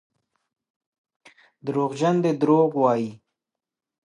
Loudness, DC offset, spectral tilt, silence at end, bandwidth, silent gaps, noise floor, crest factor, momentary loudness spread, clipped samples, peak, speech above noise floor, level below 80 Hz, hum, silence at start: -22 LUFS; under 0.1%; -7.5 dB/octave; 0.9 s; 11 kHz; none; -88 dBFS; 18 dB; 11 LU; under 0.1%; -6 dBFS; 67 dB; -76 dBFS; none; 1.65 s